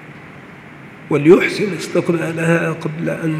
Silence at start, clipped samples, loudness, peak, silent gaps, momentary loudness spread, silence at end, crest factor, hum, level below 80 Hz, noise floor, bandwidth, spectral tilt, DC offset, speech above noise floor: 0 s; under 0.1%; -16 LUFS; 0 dBFS; none; 26 LU; 0 s; 18 dB; none; -58 dBFS; -37 dBFS; 14 kHz; -6.5 dB/octave; under 0.1%; 22 dB